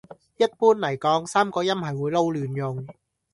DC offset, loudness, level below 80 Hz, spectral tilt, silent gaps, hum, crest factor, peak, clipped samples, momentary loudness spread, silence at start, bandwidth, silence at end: under 0.1%; -23 LUFS; -64 dBFS; -5.5 dB/octave; none; none; 18 dB; -6 dBFS; under 0.1%; 10 LU; 0.1 s; 11.5 kHz; 0.4 s